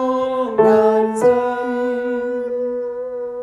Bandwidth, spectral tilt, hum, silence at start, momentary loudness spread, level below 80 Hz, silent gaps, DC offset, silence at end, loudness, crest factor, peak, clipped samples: 12 kHz; -6 dB/octave; none; 0 s; 11 LU; -58 dBFS; none; under 0.1%; 0 s; -18 LUFS; 14 dB; -2 dBFS; under 0.1%